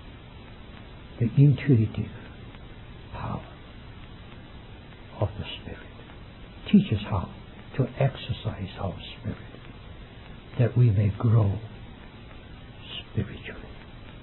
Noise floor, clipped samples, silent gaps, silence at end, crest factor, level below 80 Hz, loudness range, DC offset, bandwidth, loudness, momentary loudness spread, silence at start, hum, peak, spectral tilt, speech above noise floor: -44 dBFS; under 0.1%; none; 0 s; 20 dB; -48 dBFS; 11 LU; under 0.1%; 4.2 kHz; -26 LUFS; 24 LU; 0 s; none; -8 dBFS; -11.5 dB/octave; 20 dB